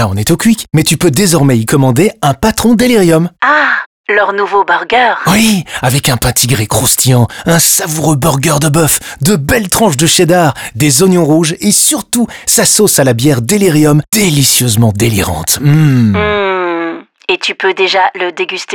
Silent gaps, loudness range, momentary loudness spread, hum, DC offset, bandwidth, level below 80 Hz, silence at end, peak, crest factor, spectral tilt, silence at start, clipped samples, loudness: 3.86-4.04 s; 2 LU; 6 LU; none; under 0.1%; over 20 kHz; -36 dBFS; 0 s; 0 dBFS; 10 dB; -4 dB/octave; 0 s; under 0.1%; -9 LUFS